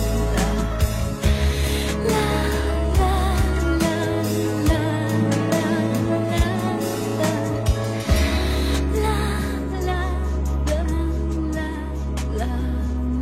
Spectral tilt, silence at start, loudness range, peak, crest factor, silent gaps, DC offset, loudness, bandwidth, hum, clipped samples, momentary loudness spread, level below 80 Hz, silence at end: -6 dB/octave; 0 s; 3 LU; -6 dBFS; 14 dB; none; under 0.1%; -22 LUFS; 15.5 kHz; none; under 0.1%; 5 LU; -24 dBFS; 0 s